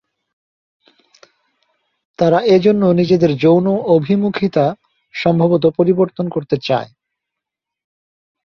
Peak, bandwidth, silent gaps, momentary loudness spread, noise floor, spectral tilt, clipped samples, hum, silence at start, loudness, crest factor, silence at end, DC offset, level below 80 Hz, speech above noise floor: 0 dBFS; 6.8 kHz; none; 8 LU; -82 dBFS; -8.5 dB/octave; under 0.1%; none; 2.2 s; -15 LUFS; 16 dB; 1.6 s; under 0.1%; -56 dBFS; 69 dB